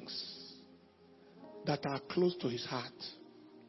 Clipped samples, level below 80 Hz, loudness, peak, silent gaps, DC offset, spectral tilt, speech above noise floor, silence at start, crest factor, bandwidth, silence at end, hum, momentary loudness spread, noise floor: under 0.1%; -78 dBFS; -38 LUFS; -20 dBFS; none; under 0.1%; -4.5 dB/octave; 26 dB; 0 s; 20 dB; 5.8 kHz; 0 s; none; 22 LU; -62 dBFS